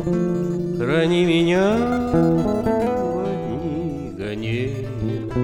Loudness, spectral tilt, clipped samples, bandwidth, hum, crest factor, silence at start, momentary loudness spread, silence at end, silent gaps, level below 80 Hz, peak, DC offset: -21 LUFS; -7.5 dB/octave; under 0.1%; 12.5 kHz; none; 14 dB; 0 s; 9 LU; 0 s; none; -42 dBFS; -6 dBFS; under 0.1%